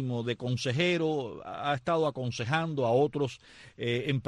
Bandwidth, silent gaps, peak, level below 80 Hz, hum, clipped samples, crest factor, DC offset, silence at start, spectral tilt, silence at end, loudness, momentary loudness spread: 10.5 kHz; none; -14 dBFS; -64 dBFS; none; under 0.1%; 16 dB; under 0.1%; 0 s; -6 dB/octave; 0.05 s; -30 LUFS; 8 LU